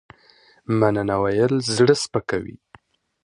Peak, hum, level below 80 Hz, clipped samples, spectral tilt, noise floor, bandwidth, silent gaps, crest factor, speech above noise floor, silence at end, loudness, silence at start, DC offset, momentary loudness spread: -2 dBFS; none; -52 dBFS; under 0.1%; -5.5 dB/octave; -55 dBFS; 11.5 kHz; none; 20 dB; 35 dB; 0.75 s; -20 LUFS; 0.7 s; under 0.1%; 11 LU